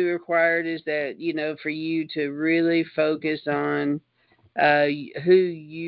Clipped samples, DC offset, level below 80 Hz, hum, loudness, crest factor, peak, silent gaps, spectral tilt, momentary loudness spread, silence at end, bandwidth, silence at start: under 0.1%; under 0.1%; -70 dBFS; none; -23 LUFS; 18 dB; -6 dBFS; none; -10 dB/octave; 9 LU; 0 s; 5.4 kHz; 0 s